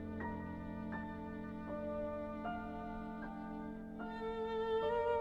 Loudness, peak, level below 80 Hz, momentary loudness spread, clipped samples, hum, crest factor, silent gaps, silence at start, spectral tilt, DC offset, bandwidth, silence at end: -43 LUFS; -26 dBFS; -58 dBFS; 10 LU; under 0.1%; none; 14 dB; none; 0 s; -8 dB/octave; under 0.1%; 7.8 kHz; 0 s